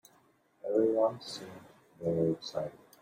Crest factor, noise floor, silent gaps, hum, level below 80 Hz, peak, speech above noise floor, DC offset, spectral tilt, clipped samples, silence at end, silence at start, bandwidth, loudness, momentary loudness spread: 18 dB; -67 dBFS; none; none; -72 dBFS; -16 dBFS; 35 dB; under 0.1%; -6.5 dB/octave; under 0.1%; 0.3 s; 0.65 s; 16 kHz; -32 LUFS; 16 LU